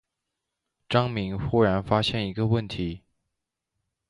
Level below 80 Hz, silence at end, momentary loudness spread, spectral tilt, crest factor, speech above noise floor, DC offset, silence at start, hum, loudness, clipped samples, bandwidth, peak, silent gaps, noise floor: -48 dBFS; 1.1 s; 10 LU; -7 dB/octave; 22 dB; 59 dB; under 0.1%; 0.9 s; none; -26 LUFS; under 0.1%; 11 kHz; -6 dBFS; none; -83 dBFS